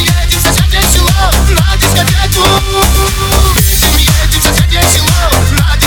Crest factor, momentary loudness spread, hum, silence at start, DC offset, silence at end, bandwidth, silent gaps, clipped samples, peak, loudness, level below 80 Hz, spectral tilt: 8 dB; 2 LU; none; 0 s; under 0.1%; 0 s; over 20 kHz; none; 0.6%; 0 dBFS; -8 LUFS; -12 dBFS; -3.5 dB/octave